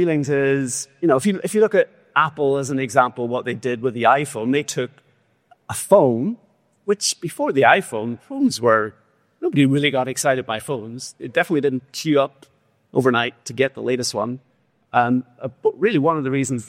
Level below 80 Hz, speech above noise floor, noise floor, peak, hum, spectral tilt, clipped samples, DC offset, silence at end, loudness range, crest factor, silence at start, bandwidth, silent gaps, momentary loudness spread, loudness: -64 dBFS; 38 dB; -57 dBFS; -2 dBFS; none; -4.5 dB/octave; under 0.1%; under 0.1%; 0 s; 3 LU; 18 dB; 0 s; 16 kHz; none; 11 LU; -20 LUFS